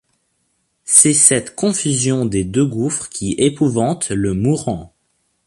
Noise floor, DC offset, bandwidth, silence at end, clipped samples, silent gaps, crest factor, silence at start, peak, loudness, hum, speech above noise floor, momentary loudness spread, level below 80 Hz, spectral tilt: -67 dBFS; under 0.1%; 16 kHz; 0.6 s; under 0.1%; none; 18 dB; 0.85 s; 0 dBFS; -15 LUFS; none; 50 dB; 12 LU; -44 dBFS; -4 dB/octave